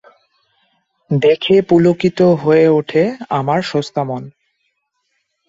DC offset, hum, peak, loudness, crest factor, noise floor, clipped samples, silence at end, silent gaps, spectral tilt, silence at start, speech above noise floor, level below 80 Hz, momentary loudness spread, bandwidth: under 0.1%; none; -2 dBFS; -14 LUFS; 14 dB; -68 dBFS; under 0.1%; 1.2 s; none; -7.5 dB/octave; 1.1 s; 55 dB; -56 dBFS; 10 LU; 7.8 kHz